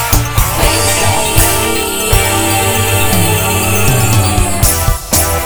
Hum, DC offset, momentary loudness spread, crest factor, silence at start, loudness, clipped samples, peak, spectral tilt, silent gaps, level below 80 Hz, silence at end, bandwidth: none; under 0.1%; 2 LU; 10 dB; 0 s; -11 LUFS; 0.4%; 0 dBFS; -3.5 dB/octave; none; -20 dBFS; 0 s; over 20 kHz